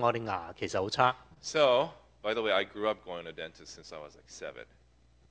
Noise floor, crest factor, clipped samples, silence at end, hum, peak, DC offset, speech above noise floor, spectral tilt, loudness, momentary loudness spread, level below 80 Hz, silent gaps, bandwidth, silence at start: -64 dBFS; 24 dB; under 0.1%; 0.65 s; none; -8 dBFS; under 0.1%; 32 dB; -4 dB/octave; -31 LUFS; 20 LU; -64 dBFS; none; 9.4 kHz; 0 s